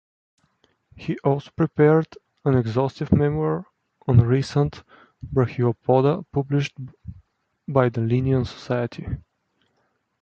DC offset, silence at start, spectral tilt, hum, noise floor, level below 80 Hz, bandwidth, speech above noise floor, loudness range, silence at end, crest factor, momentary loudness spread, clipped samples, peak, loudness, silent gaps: under 0.1%; 1 s; -8.5 dB/octave; none; -70 dBFS; -44 dBFS; 7.8 kHz; 49 dB; 4 LU; 1 s; 20 dB; 17 LU; under 0.1%; -2 dBFS; -22 LUFS; none